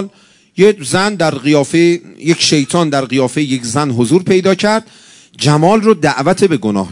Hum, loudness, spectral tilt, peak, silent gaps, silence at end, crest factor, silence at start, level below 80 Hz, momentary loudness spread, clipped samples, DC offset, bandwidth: none; -12 LUFS; -5 dB/octave; 0 dBFS; none; 0 s; 12 dB; 0 s; -54 dBFS; 6 LU; 0.5%; under 0.1%; 12 kHz